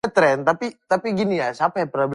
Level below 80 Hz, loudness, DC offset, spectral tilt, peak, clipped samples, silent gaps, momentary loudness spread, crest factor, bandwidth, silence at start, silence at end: -62 dBFS; -21 LUFS; under 0.1%; -6 dB/octave; -4 dBFS; under 0.1%; none; 6 LU; 16 dB; 11.5 kHz; 0.05 s; 0 s